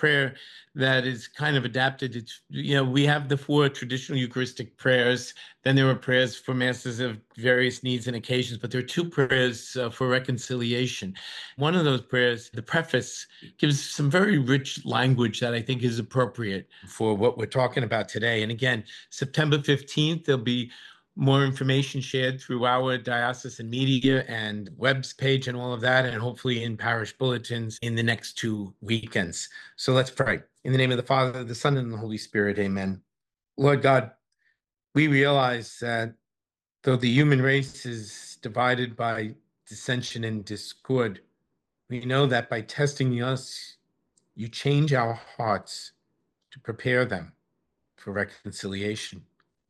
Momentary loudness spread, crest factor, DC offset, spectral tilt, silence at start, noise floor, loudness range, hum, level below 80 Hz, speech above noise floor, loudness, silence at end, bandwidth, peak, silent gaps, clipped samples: 13 LU; 18 dB; under 0.1%; -5.5 dB/octave; 0 s; under -90 dBFS; 4 LU; none; -68 dBFS; over 64 dB; -26 LUFS; 0.5 s; 12.5 kHz; -8 dBFS; none; under 0.1%